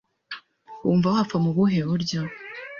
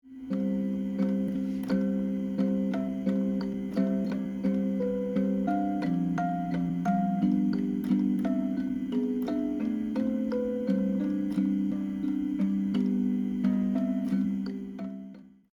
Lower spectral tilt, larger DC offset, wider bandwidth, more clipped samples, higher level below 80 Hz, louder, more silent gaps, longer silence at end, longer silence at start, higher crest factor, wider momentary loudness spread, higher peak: second, -7 dB/octave vs -9 dB/octave; neither; about the same, 7 kHz vs 7 kHz; neither; about the same, -58 dBFS vs -58 dBFS; first, -23 LUFS vs -29 LUFS; neither; second, 0 s vs 0.25 s; first, 0.3 s vs 0.05 s; about the same, 16 dB vs 14 dB; first, 18 LU vs 4 LU; first, -8 dBFS vs -16 dBFS